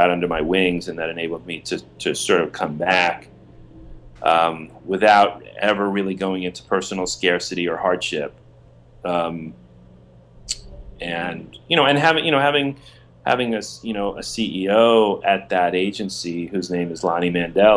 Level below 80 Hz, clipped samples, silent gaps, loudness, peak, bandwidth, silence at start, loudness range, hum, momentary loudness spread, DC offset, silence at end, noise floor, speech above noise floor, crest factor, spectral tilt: -48 dBFS; under 0.1%; none; -20 LUFS; 0 dBFS; 11 kHz; 0 s; 6 LU; none; 14 LU; under 0.1%; 0 s; -48 dBFS; 28 dB; 20 dB; -4 dB/octave